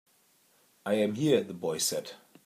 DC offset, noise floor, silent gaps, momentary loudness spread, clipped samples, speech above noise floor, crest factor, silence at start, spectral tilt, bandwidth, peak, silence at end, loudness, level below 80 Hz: under 0.1%; -67 dBFS; none; 13 LU; under 0.1%; 37 dB; 20 dB; 0.85 s; -4 dB/octave; 15.5 kHz; -12 dBFS; 0.3 s; -29 LUFS; -76 dBFS